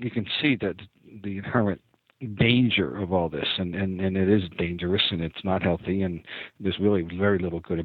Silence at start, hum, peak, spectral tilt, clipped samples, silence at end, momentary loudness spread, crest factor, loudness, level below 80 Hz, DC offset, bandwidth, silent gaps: 0 s; none; -8 dBFS; -9.5 dB/octave; under 0.1%; 0 s; 13 LU; 18 dB; -25 LUFS; -52 dBFS; under 0.1%; 4.7 kHz; none